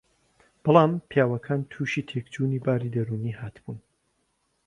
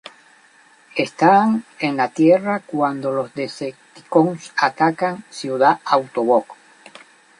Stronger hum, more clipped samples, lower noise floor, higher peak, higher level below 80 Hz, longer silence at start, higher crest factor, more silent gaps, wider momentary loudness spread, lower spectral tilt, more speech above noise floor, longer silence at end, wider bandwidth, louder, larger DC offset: neither; neither; first, -72 dBFS vs -52 dBFS; about the same, -2 dBFS vs -2 dBFS; first, -62 dBFS vs -70 dBFS; second, 0.65 s vs 0.95 s; first, 24 dB vs 18 dB; neither; first, 18 LU vs 12 LU; first, -8 dB/octave vs -6 dB/octave; first, 47 dB vs 34 dB; about the same, 0.85 s vs 0.85 s; about the same, 10.5 kHz vs 11 kHz; second, -25 LUFS vs -19 LUFS; neither